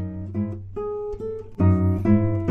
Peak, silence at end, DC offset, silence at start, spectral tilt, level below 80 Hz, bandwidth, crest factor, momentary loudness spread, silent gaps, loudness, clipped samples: -6 dBFS; 0 s; under 0.1%; 0 s; -11.5 dB/octave; -42 dBFS; 2.8 kHz; 16 dB; 12 LU; none; -24 LUFS; under 0.1%